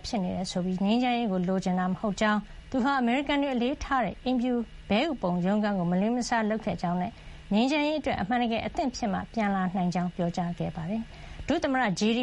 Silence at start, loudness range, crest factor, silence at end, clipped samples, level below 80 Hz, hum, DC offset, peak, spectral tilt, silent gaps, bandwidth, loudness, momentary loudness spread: 0 s; 2 LU; 16 dB; 0 s; under 0.1%; -48 dBFS; none; under 0.1%; -12 dBFS; -6 dB/octave; none; 11 kHz; -28 LUFS; 6 LU